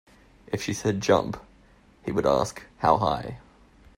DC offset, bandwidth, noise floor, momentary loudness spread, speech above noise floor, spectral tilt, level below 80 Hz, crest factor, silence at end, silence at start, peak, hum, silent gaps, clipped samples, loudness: under 0.1%; 16 kHz; -56 dBFS; 16 LU; 31 dB; -5.5 dB/octave; -52 dBFS; 22 dB; 0.6 s; 0.5 s; -4 dBFS; none; none; under 0.1%; -26 LUFS